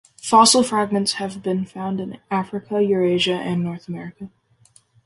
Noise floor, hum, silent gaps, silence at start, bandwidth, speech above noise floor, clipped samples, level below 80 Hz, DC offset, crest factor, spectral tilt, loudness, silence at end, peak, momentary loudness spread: -56 dBFS; none; none; 0.25 s; 12 kHz; 36 dB; under 0.1%; -62 dBFS; under 0.1%; 20 dB; -4 dB/octave; -20 LUFS; 0.8 s; -2 dBFS; 18 LU